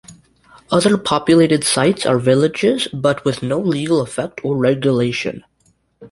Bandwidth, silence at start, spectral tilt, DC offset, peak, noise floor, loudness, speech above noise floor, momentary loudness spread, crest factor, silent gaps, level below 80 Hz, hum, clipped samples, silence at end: 11.5 kHz; 0.1 s; -5 dB/octave; under 0.1%; -2 dBFS; -60 dBFS; -16 LUFS; 44 dB; 8 LU; 16 dB; none; -52 dBFS; none; under 0.1%; 0.05 s